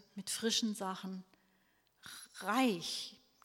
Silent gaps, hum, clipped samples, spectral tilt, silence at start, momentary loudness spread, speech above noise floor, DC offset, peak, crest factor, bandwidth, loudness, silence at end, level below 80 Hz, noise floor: none; none; under 0.1%; -3 dB/octave; 0.15 s; 18 LU; 37 dB; under 0.1%; -20 dBFS; 20 dB; 17 kHz; -36 LUFS; 0.3 s; -82 dBFS; -74 dBFS